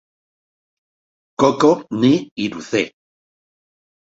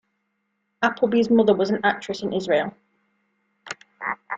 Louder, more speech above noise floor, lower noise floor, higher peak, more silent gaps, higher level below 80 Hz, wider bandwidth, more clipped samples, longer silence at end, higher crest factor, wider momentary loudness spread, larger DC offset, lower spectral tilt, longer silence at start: first, -18 LUFS vs -22 LUFS; first, over 73 dB vs 54 dB; first, under -90 dBFS vs -74 dBFS; about the same, -2 dBFS vs -4 dBFS; first, 2.31-2.36 s vs none; first, -60 dBFS vs -66 dBFS; about the same, 7.8 kHz vs 7.8 kHz; neither; first, 1.3 s vs 0 s; about the same, 18 dB vs 20 dB; second, 11 LU vs 16 LU; neither; about the same, -5.5 dB/octave vs -5.5 dB/octave; first, 1.4 s vs 0.8 s